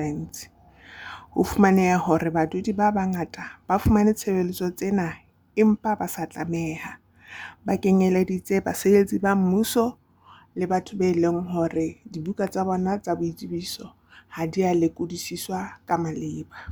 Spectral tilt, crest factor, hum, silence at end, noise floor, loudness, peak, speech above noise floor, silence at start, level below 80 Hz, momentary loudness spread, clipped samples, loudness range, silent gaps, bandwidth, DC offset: -6.5 dB/octave; 20 dB; none; 0 s; -53 dBFS; -24 LUFS; -4 dBFS; 30 dB; 0 s; -48 dBFS; 16 LU; under 0.1%; 5 LU; none; over 20 kHz; under 0.1%